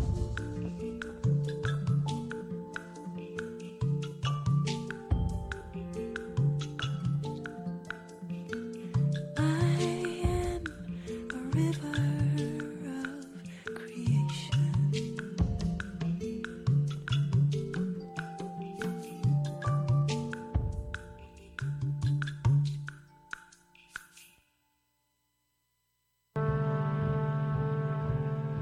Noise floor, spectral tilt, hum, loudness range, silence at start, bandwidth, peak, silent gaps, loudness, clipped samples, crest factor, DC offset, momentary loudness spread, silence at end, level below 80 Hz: -78 dBFS; -7 dB/octave; none; 4 LU; 0 s; 11 kHz; -16 dBFS; none; -33 LUFS; under 0.1%; 16 dB; under 0.1%; 12 LU; 0 s; -46 dBFS